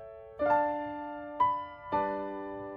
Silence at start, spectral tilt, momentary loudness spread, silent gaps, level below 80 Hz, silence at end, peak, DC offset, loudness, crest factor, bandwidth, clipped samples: 0 s; -8 dB/octave; 12 LU; none; -62 dBFS; 0 s; -16 dBFS; under 0.1%; -32 LUFS; 16 dB; 6.4 kHz; under 0.1%